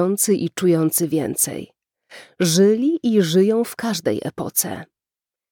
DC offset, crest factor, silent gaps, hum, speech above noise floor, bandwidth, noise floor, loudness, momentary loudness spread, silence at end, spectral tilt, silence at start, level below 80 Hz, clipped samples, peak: under 0.1%; 16 dB; none; none; 71 dB; 20 kHz; -90 dBFS; -19 LUFS; 8 LU; 0.65 s; -4.5 dB/octave; 0 s; -64 dBFS; under 0.1%; -4 dBFS